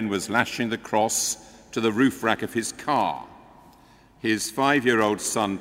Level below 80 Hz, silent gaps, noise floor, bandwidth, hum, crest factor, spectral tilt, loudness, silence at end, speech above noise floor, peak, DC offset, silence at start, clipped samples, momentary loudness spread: -60 dBFS; none; -54 dBFS; 16 kHz; none; 22 dB; -3.5 dB/octave; -24 LUFS; 0 s; 30 dB; -4 dBFS; under 0.1%; 0 s; under 0.1%; 7 LU